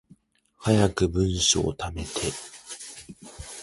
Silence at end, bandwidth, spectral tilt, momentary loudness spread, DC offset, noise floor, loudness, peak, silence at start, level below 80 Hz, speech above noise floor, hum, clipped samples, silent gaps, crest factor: 0 s; 11.5 kHz; -4 dB/octave; 19 LU; under 0.1%; -59 dBFS; -24 LUFS; -6 dBFS; 0.6 s; -42 dBFS; 35 dB; none; under 0.1%; none; 20 dB